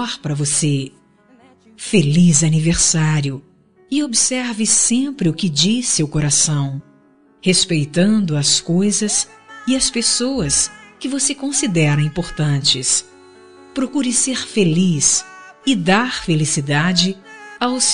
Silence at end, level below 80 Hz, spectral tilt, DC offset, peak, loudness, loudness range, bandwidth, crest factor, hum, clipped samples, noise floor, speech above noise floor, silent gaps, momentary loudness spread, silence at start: 0 s; -44 dBFS; -3.5 dB/octave; 0.6%; 0 dBFS; -16 LUFS; 2 LU; 11 kHz; 18 dB; none; under 0.1%; -52 dBFS; 35 dB; none; 10 LU; 0 s